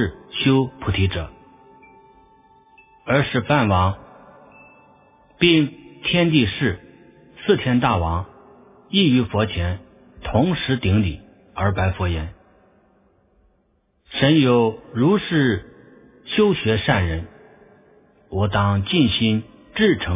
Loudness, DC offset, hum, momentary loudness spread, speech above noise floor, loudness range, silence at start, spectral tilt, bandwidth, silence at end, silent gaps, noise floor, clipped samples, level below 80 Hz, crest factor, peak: -20 LUFS; under 0.1%; none; 14 LU; 46 dB; 4 LU; 0 s; -10.5 dB/octave; 3.9 kHz; 0 s; none; -64 dBFS; under 0.1%; -36 dBFS; 20 dB; -2 dBFS